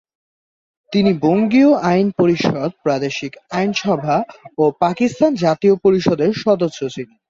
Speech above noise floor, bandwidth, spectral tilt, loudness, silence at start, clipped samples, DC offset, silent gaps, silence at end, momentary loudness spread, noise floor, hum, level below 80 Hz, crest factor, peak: over 74 dB; 7.6 kHz; -6.5 dB/octave; -17 LUFS; 0.9 s; under 0.1%; under 0.1%; none; 0.25 s; 9 LU; under -90 dBFS; none; -54 dBFS; 14 dB; -2 dBFS